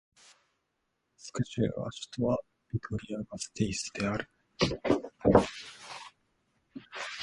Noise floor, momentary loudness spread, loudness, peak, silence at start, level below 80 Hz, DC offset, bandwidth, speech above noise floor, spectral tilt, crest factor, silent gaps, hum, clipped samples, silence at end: -80 dBFS; 20 LU; -32 LUFS; -6 dBFS; 1.2 s; -52 dBFS; under 0.1%; 11.5 kHz; 48 dB; -5.5 dB/octave; 28 dB; none; none; under 0.1%; 0 s